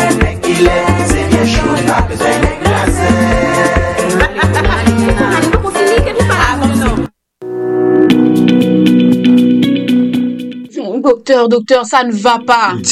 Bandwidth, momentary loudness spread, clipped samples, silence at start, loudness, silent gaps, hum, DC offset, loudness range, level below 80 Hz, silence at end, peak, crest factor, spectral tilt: 13.5 kHz; 6 LU; under 0.1%; 0 s; -11 LUFS; none; none; under 0.1%; 2 LU; -24 dBFS; 0 s; 0 dBFS; 10 dB; -5.5 dB/octave